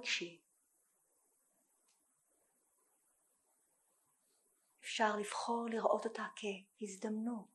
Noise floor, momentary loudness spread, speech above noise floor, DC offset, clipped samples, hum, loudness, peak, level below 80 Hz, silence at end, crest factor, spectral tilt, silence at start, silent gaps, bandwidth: -79 dBFS; 12 LU; 39 dB; under 0.1%; under 0.1%; none; -40 LUFS; -18 dBFS; under -90 dBFS; 0.1 s; 26 dB; -3 dB/octave; 0 s; none; 12 kHz